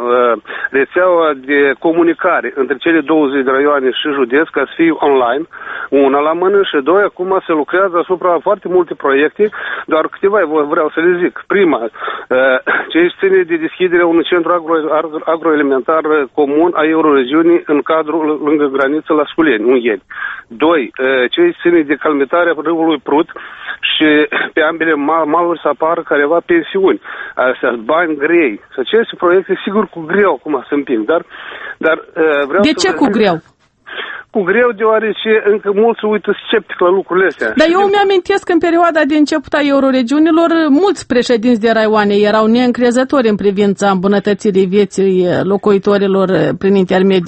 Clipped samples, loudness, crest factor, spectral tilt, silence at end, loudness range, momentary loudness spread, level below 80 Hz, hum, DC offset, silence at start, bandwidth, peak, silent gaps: under 0.1%; -12 LUFS; 12 dB; -5.5 dB/octave; 0 s; 3 LU; 6 LU; -52 dBFS; none; under 0.1%; 0 s; 8.4 kHz; 0 dBFS; none